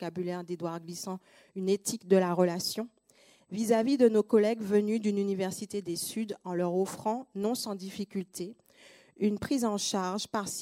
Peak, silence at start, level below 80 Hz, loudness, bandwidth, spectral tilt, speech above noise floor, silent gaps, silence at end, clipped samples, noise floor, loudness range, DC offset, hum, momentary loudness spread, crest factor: -12 dBFS; 0 s; -72 dBFS; -30 LUFS; 16 kHz; -5 dB/octave; 33 dB; none; 0 s; under 0.1%; -63 dBFS; 6 LU; under 0.1%; none; 13 LU; 20 dB